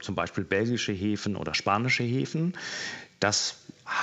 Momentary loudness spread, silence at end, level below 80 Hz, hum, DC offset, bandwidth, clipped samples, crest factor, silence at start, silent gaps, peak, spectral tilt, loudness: 8 LU; 0 s; -64 dBFS; none; under 0.1%; 8.4 kHz; under 0.1%; 20 dB; 0 s; none; -8 dBFS; -4 dB/octave; -28 LUFS